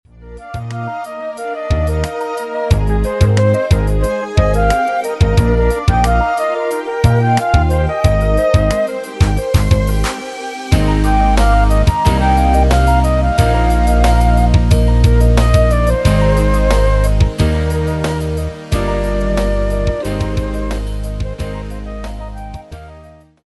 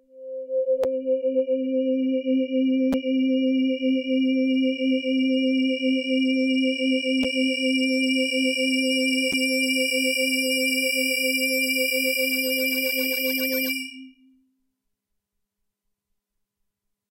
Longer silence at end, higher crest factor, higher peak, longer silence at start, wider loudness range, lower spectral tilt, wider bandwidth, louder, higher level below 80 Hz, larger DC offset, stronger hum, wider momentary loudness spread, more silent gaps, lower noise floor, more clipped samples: second, 0.45 s vs 3 s; about the same, 12 dB vs 12 dB; first, 0 dBFS vs -12 dBFS; about the same, 0.2 s vs 0.15 s; first, 7 LU vs 4 LU; first, -6.5 dB/octave vs -1.5 dB/octave; second, 12 kHz vs 16 kHz; first, -15 LUFS vs -22 LUFS; first, -16 dBFS vs -66 dBFS; neither; neither; first, 12 LU vs 3 LU; neither; second, -40 dBFS vs -79 dBFS; neither